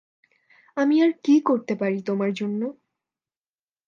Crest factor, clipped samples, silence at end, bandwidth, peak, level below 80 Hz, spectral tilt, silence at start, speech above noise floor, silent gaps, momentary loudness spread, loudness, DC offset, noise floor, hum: 16 dB; under 0.1%; 1.15 s; 7.2 kHz; -8 dBFS; -78 dBFS; -7 dB/octave; 0.75 s; over 68 dB; none; 10 LU; -23 LUFS; under 0.1%; under -90 dBFS; none